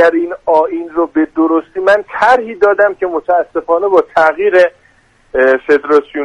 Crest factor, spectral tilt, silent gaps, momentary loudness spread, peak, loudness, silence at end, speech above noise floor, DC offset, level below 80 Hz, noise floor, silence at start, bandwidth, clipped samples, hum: 12 dB; -5 dB/octave; none; 5 LU; 0 dBFS; -12 LUFS; 0 s; 38 dB; under 0.1%; -50 dBFS; -50 dBFS; 0 s; 10 kHz; under 0.1%; none